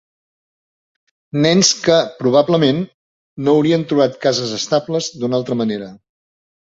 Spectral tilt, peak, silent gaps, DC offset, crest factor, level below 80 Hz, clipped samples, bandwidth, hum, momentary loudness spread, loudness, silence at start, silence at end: -4.5 dB/octave; 0 dBFS; 2.94-3.36 s; under 0.1%; 18 dB; -58 dBFS; under 0.1%; 8 kHz; none; 10 LU; -16 LUFS; 1.35 s; 0.7 s